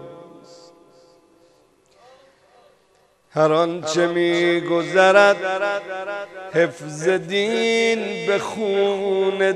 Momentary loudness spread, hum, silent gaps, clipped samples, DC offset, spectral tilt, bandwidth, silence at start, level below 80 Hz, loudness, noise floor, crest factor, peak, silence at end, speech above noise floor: 12 LU; none; none; under 0.1%; under 0.1%; -4.5 dB/octave; 11.5 kHz; 0 s; -72 dBFS; -19 LUFS; -59 dBFS; 20 dB; 0 dBFS; 0 s; 40 dB